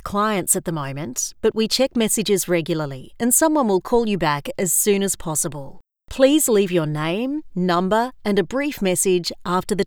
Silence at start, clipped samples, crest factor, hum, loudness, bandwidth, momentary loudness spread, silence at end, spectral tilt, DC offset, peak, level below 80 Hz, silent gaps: 0.05 s; under 0.1%; 18 dB; none; -20 LUFS; over 20 kHz; 9 LU; 0 s; -4 dB/octave; under 0.1%; -2 dBFS; -46 dBFS; none